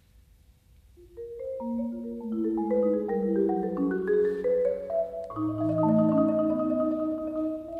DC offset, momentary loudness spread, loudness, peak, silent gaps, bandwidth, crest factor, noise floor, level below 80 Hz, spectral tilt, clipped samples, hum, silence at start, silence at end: under 0.1%; 10 LU; -28 LUFS; -12 dBFS; none; 4.5 kHz; 16 dB; -58 dBFS; -58 dBFS; -10.5 dB/octave; under 0.1%; none; 1 s; 0 s